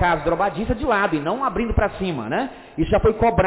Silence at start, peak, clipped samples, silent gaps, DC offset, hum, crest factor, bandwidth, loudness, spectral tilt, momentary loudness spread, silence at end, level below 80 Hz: 0 s; -8 dBFS; under 0.1%; none; under 0.1%; none; 12 dB; 4 kHz; -21 LUFS; -10.5 dB/octave; 7 LU; 0 s; -32 dBFS